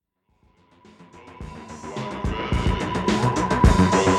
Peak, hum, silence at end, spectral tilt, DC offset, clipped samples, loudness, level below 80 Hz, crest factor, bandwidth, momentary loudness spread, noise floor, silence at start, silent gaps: -2 dBFS; none; 0 s; -6 dB/octave; under 0.1%; under 0.1%; -22 LUFS; -30 dBFS; 20 dB; 12.5 kHz; 21 LU; -64 dBFS; 1 s; none